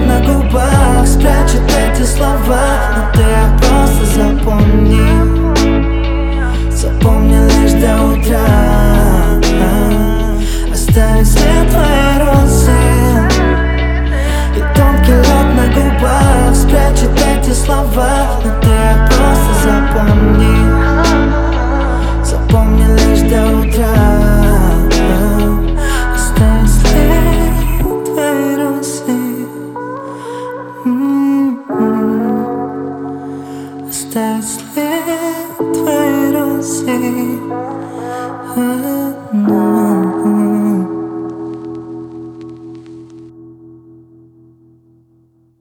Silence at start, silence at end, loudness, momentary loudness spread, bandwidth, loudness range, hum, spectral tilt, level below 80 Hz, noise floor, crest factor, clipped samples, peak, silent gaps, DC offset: 0 s; 2.15 s; -12 LUFS; 12 LU; 17 kHz; 7 LU; none; -6 dB/octave; -14 dBFS; -52 dBFS; 10 dB; under 0.1%; 0 dBFS; none; under 0.1%